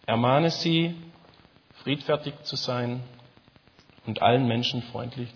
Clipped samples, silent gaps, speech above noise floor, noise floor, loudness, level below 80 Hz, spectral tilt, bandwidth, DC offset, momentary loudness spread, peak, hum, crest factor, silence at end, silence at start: under 0.1%; none; 32 dB; -57 dBFS; -26 LUFS; -66 dBFS; -6 dB/octave; 5.4 kHz; under 0.1%; 15 LU; -6 dBFS; none; 20 dB; 0.05 s; 0.1 s